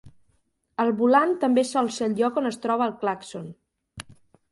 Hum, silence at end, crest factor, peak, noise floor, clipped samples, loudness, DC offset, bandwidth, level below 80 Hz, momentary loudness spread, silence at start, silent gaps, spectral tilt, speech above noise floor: none; 0.5 s; 18 dB; -6 dBFS; -69 dBFS; under 0.1%; -23 LUFS; under 0.1%; 11.5 kHz; -64 dBFS; 22 LU; 0.05 s; none; -5 dB/octave; 46 dB